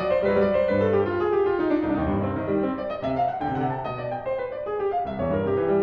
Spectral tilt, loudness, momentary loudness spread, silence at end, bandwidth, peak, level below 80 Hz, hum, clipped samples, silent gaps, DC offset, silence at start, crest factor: -9.5 dB/octave; -25 LUFS; 8 LU; 0 s; 5.6 kHz; -10 dBFS; -46 dBFS; none; under 0.1%; none; under 0.1%; 0 s; 14 dB